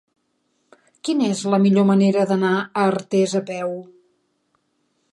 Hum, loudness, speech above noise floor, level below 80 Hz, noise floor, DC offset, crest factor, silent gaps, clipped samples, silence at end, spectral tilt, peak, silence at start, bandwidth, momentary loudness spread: none; -19 LUFS; 51 dB; -68 dBFS; -69 dBFS; under 0.1%; 16 dB; none; under 0.1%; 1.3 s; -6.5 dB/octave; -6 dBFS; 1.05 s; 11.5 kHz; 12 LU